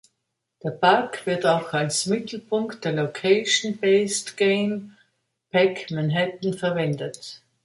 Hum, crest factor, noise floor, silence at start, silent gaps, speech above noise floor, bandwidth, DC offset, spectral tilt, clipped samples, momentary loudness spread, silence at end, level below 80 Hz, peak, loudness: none; 20 dB; -79 dBFS; 0.65 s; none; 56 dB; 11.5 kHz; under 0.1%; -4 dB/octave; under 0.1%; 10 LU; 0.3 s; -68 dBFS; -4 dBFS; -23 LUFS